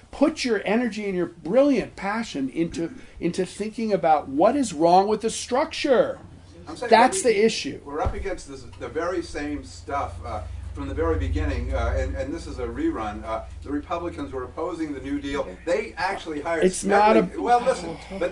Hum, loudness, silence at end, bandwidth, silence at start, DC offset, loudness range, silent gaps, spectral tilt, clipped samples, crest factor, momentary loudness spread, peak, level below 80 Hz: none; -24 LUFS; 0 s; 11 kHz; 0.15 s; under 0.1%; 8 LU; none; -5 dB/octave; under 0.1%; 22 dB; 14 LU; -2 dBFS; -38 dBFS